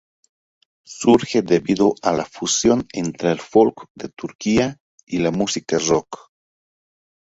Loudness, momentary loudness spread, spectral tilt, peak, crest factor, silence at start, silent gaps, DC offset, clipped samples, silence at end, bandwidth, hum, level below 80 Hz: -19 LUFS; 15 LU; -4.5 dB/octave; -2 dBFS; 18 dB; 0.9 s; 3.90-3.95 s, 4.35-4.39 s, 4.80-4.98 s; under 0.1%; under 0.1%; 1.2 s; 8 kHz; none; -52 dBFS